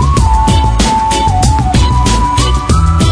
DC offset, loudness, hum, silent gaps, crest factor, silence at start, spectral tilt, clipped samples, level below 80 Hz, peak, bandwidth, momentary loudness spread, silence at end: under 0.1%; -10 LUFS; none; none; 8 dB; 0 s; -5 dB/octave; under 0.1%; -12 dBFS; 0 dBFS; 11 kHz; 1 LU; 0 s